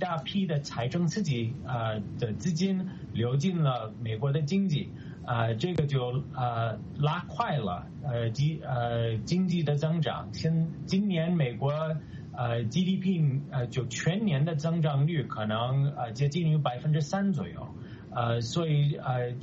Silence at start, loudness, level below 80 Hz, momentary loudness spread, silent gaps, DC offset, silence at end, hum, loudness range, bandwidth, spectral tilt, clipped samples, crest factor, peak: 0 s; -30 LUFS; -58 dBFS; 6 LU; none; under 0.1%; 0 s; none; 2 LU; 7.8 kHz; -6.5 dB/octave; under 0.1%; 16 dB; -12 dBFS